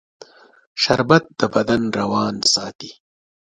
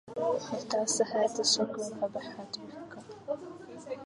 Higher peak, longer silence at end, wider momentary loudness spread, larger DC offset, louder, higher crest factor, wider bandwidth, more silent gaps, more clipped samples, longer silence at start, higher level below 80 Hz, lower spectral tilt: first, 0 dBFS vs -12 dBFS; first, 0.6 s vs 0 s; about the same, 18 LU vs 19 LU; neither; first, -18 LUFS vs -31 LUFS; about the same, 20 dB vs 20 dB; about the same, 11 kHz vs 11.5 kHz; first, 2.75-2.79 s vs none; neither; first, 0.75 s vs 0.05 s; first, -54 dBFS vs -74 dBFS; first, -4 dB/octave vs -2 dB/octave